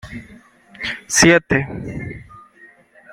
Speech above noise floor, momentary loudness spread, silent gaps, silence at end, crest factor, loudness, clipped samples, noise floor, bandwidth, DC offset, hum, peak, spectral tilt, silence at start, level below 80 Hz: 31 dB; 24 LU; none; 0 s; 20 dB; -16 LUFS; under 0.1%; -49 dBFS; 16 kHz; under 0.1%; none; 0 dBFS; -3.5 dB/octave; 0.05 s; -44 dBFS